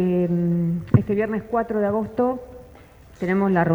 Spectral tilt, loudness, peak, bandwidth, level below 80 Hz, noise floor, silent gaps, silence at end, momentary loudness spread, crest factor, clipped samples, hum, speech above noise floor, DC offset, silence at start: -10 dB/octave; -22 LUFS; -2 dBFS; over 20 kHz; -48 dBFS; -47 dBFS; none; 0 s; 5 LU; 18 dB; under 0.1%; none; 25 dB; under 0.1%; 0 s